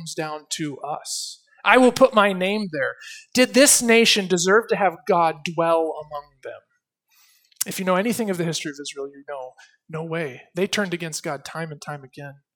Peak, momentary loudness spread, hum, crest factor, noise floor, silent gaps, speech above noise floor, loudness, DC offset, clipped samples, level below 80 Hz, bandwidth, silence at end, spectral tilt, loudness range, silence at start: 0 dBFS; 20 LU; none; 22 dB; -68 dBFS; none; 46 dB; -20 LUFS; under 0.1%; under 0.1%; -66 dBFS; 19 kHz; 0.2 s; -3 dB/octave; 11 LU; 0 s